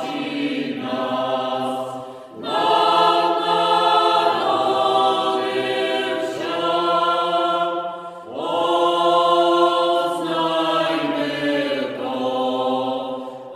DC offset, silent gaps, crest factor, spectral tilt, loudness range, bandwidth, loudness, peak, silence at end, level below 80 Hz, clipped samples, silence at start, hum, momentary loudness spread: under 0.1%; none; 16 dB; -4.5 dB/octave; 4 LU; 15.5 kHz; -20 LUFS; -4 dBFS; 0 s; -70 dBFS; under 0.1%; 0 s; none; 10 LU